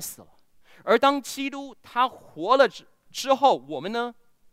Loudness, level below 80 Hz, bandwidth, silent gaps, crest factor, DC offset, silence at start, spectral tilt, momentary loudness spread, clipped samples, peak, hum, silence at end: -24 LUFS; -70 dBFS; 16 kHz; none; 20 dB; under 0.1%; 0 s; -3 dB/octave; 15 LU; under 0.1%; -4 dBFS; none; 0.4 s